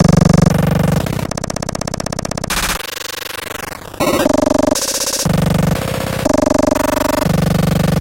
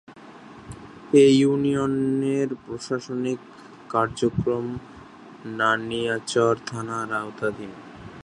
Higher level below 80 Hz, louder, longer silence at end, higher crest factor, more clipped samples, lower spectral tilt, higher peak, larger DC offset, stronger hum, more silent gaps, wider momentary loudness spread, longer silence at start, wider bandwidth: first, -30 dBFS vs -56 dBFS; first, -15 LUFS vs -23 LUFS; about the same, 0 s vs 0 s; second, 14 dB vs 20 dB; neither; about the same, -5 dB/octave vs -5.5 dB/octave; first, 0 dBFS vs -4 dBFS; neither; neither; neither; second, 10 LU vs 23 LU; about the same, 0 s vs 0.1 s; first, 17.5 kHz vs 10.5 kHz